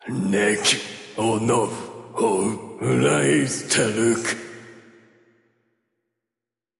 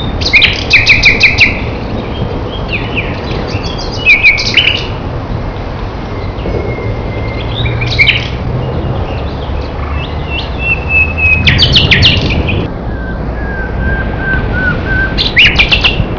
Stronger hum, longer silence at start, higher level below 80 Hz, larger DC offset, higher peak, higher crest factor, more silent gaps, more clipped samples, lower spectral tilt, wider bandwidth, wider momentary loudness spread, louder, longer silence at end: neither; about the same, 0.05 s vs 0 s; second, -60 dBFS vs -20 dBFS; second, under 0.1% vs 0.2%; second, -6 dBFS vs 0 dBFS; first, 18 dB vs 12 dB; neither; second, under 0.1% vs 1%; about the same, -4 dB/octave vs -4.5 dB/octave; first, 11.5 kHz vs 5.4 kHz; about the same, 14 LU vs 14 LU; second, -21 LUFS vs -9 LUFS; first, 2 s vs 0 s